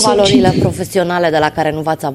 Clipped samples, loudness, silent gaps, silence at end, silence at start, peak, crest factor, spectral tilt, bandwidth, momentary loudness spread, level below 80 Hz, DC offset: under 0.1%; -13 LUFS; none; 0 s; 0 s; 0 dBFS; 12 dB; -5 dB/octave; 15.5 kHz; 7 LU; -40 dBFS; under 0.1%